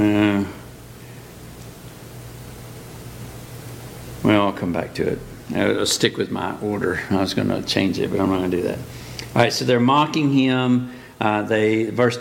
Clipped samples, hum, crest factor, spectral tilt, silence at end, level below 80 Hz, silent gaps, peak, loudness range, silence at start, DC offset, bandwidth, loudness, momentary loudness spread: under 0.1%; none; 20 dB; -5 dB/octave; 0 s; -48 dBFS; none; 0 dBFS; 13 LU; 0 s; under 0.1%; 17 kHz; -20 LUFS; 21 LU